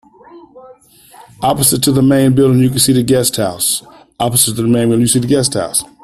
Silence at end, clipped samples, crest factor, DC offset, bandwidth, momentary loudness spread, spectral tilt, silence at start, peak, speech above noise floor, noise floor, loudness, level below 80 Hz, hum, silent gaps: 0.2 s; under 0.1%; 14 dB; under 0.1%; 15 kHz; 6 LU; -4.5 dB/octave; 0.35 s; 0 dBFS; 27 dB; -40 dBFS; -12 LUFS; -44 dBFS; none; none